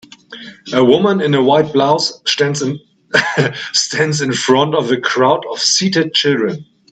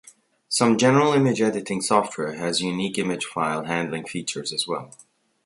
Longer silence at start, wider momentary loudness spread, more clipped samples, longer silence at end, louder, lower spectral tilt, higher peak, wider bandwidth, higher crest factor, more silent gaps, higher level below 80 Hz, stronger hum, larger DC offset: second, 0.3 s vs 0.5 s; about the same, 9 LU vs 11 LU; neither; second, 0.3 s vs 0.6 s; first, -14 LUFS vs -23 LUFS; about the same, -3.5 dB/octave vs -4.5 dB/octave; first, 0 dBFS vs -4 dBFS; second, 9.2 kHz vs 11.5 kHz; second, 14 dB vs 20 dB; neither; about the same, -60 dBFS vs -64 dBFS; neither; neither